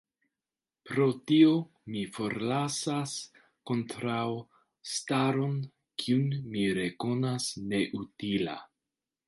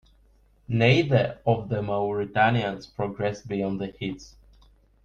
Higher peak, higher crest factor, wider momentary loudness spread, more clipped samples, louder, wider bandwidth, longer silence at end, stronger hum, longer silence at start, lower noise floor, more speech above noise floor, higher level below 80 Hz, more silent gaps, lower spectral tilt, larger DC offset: second, -10 dBFS vs -6 dBFS; about the same, 20 dB vs 20 dB; about the same, 12 LU vs 12 LU; neither; second, -30 LUFS vs -25 LUFS; first, 11.5 kHz vs 7.2 kHz; second, 0.6 s vs 0.75 s; neither; first, 0.85 s vs 0.7 s; first, under -90 dBFS vs -60 dBFS; first, over 61 dB vs 35 dB; second, -68 dBFS vs -54 dBFS; neither; second, -5.5 dB/octave vs -7 dB/octave; neither